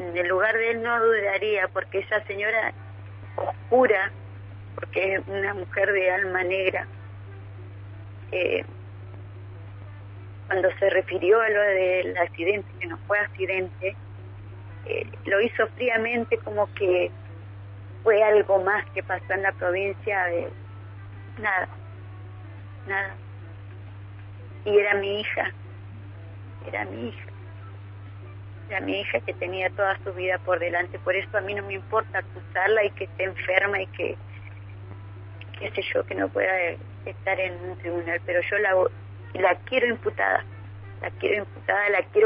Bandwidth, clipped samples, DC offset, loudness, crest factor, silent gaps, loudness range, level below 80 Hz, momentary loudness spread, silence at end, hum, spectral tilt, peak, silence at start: 5.4 kHz; under 0.1%; under 0.1%; -25 LUFS; 22 dB; none; 8 LU; -58 dBFS; 20 LU; 0 s; none; -9 dB/octave; -4 dBFS; 0 s